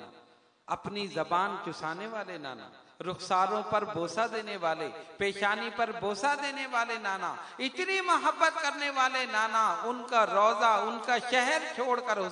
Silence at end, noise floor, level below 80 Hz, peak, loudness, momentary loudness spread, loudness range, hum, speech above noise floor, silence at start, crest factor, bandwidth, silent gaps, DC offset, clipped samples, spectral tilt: 0 s; -61 dBFS; -74 dBFS; -10 dBFS; -30 LUFS; 11 LU; 6 LU; none; 31 dB; 0 s; 20 dB; 10.5 kHz; none; under 0.1%; under 0.1%; -3 dB/octave